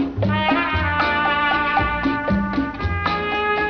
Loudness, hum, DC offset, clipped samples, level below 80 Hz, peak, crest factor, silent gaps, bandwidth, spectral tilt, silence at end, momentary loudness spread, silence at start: -20 LUFS; none; under 0.1%; under 0.1%; -34 dBFS; -6 dBFS; 14 dB; none; 6.6 kHz; -7.5 dB/octave; 0 s; 5 LU; 0 s